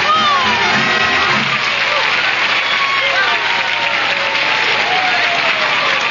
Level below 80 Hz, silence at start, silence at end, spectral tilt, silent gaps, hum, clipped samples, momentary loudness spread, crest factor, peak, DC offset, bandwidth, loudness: -54 dBFS; 0 s; 0 s; -2 dB/octave; none; none; under 0.1%; 2 LU; 12 dB; -2 dBFS; 0.2%; 7.4 kHz; -12 LUFS